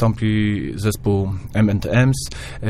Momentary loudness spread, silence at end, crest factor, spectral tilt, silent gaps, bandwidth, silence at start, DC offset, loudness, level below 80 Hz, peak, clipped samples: 6 LU; 0 s; 16 dB; -6.5 dB/octave; none; 15.5 kHz; 0 s; under 0.1%; -20 LUFS; -36 dBFS; -2 dBFS; under 0.1%